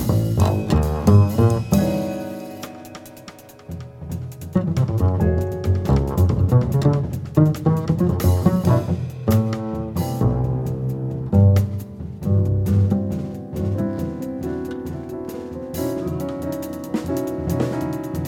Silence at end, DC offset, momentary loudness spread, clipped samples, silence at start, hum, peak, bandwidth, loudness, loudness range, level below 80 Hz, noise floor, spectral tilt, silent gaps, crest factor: 0 s; under 0.1%; 14 LU; under 0.1%; 0 s; none; -2 dBFS; 16.5 kHz; -21 LUFS; 8 LU; -34 dBFS; -42 dBFS; -8 dB/octave; none; 18 dB